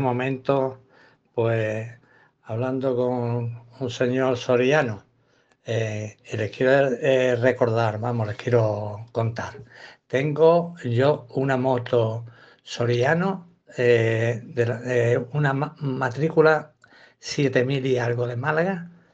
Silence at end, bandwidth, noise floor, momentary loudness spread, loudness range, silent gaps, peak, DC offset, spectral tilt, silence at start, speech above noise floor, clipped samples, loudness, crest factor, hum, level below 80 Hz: 0.25 s; 7.8 kHz; -63 dBFS; 13 LU; 3 LU; none; -4 dBFS; under 0.1%; -7 dB/octave; 0 s; 40 dB; under 0.1%; -23 LUFS; 18 dB; none; -64 dBFS